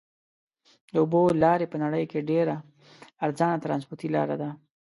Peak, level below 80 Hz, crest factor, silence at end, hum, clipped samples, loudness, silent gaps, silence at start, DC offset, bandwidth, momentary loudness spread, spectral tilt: -8 dBFS; -64 dBFS; 18 dB; 0.3 s; none; under 0.1%; -26 LUFS; none; 0.95 s; under 0.1%; 11.5 kHz; 10 LU; -8 dB/octave